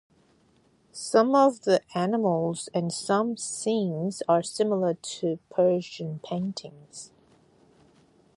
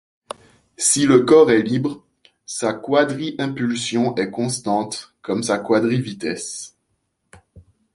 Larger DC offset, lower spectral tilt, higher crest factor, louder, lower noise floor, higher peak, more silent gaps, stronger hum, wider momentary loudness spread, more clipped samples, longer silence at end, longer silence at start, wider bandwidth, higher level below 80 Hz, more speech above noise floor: neither; about the same, -5.5 dB/octave vs -4.5 dB/octave; about the same, 20 dB vs 18 dB; second, -26 LUFS vs -19 LUFS; second, -63 dBFS vs -71 dBFS; second, -6 dBFS vs -2 dBFS; neither; neither; about the same, 17 LU vs 19 LU; neither; first, 1.3 s vs 0.35 s; first, 0.95 s vs 0.8 s; about the same, 11.5 kHz vs 11.5 kHz; second, -72 dBFS vs -60 dBFS; second, 37 dB vs 53 dB